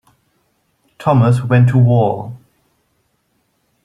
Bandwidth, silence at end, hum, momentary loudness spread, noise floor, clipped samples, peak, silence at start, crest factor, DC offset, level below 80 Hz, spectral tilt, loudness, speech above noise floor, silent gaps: 10 kHz; 1.5 s; none; 13 LU; -64 dBFS; under 0.1%; -2 dBFS; 1 s; 14 dB; under 0.1%; -50 dBFS; -9 dB/octave; -13 LUFS; 52 dB; none